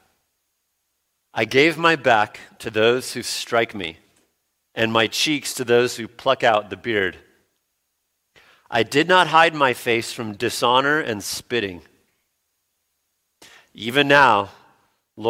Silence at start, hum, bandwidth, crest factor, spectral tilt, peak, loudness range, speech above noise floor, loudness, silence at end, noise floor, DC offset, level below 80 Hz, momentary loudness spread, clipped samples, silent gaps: 1.35 s; none; 16.5 kHz; 20 dB; -3.5 dB/octave; 0 dBFS; 5 LU; 54 dB; -19 LUFS; 0 s; -74 dBFS; under 0.1%; -62 dBFS; 12 LU; under 0.1%; none